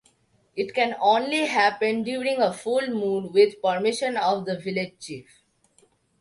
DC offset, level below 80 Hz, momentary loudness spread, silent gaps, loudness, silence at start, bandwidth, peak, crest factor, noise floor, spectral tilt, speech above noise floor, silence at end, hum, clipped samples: under 0.1%; -72 dBFS; 11 LU; none; -24 LUFS; 0.55 s; 11.5 kHz; -6 dBFS; 18 dB; -64 dBFS; -4.5 dB/octave; 41 dB; 1 s; none; under 0.1%